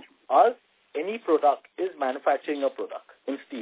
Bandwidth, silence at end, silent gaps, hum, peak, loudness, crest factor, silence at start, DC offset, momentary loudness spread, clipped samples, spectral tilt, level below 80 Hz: 4 kHz; 0 s; none; none; -6 dBFS; -26 LUFS; 20 dB; 0.3 s; under 0.1%; 16 LU; under 0.1%; -7.5 dB/octave; -84 dBFS